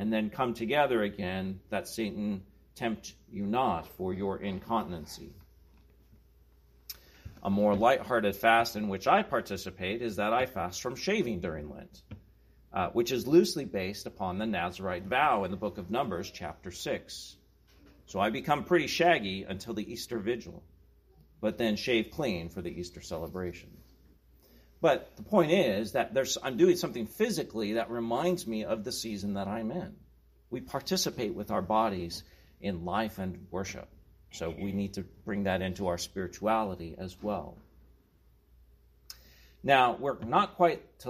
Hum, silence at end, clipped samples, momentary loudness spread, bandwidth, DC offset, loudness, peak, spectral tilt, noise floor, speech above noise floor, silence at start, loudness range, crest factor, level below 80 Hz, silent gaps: none; 0 s; under 0.1%; 16 LU; 15.5 kHz; under 0.1%; -31 LUFS; -10 dBFS; -5 dB/octave; -64 dBFS; 33 dB; 0 s; 7 LU; 22 dB; -58 dBFS; none